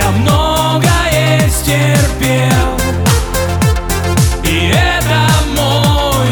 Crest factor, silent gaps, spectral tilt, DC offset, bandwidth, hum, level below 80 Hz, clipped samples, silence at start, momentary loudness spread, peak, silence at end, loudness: 10 dB; none; -4.5 dB/octave; under 0.1%; over 20 kHz; none; -20 dBFS; under 0.1%; 0 s; 3 LU; 0 dBFS; 0 s; -12 LUFS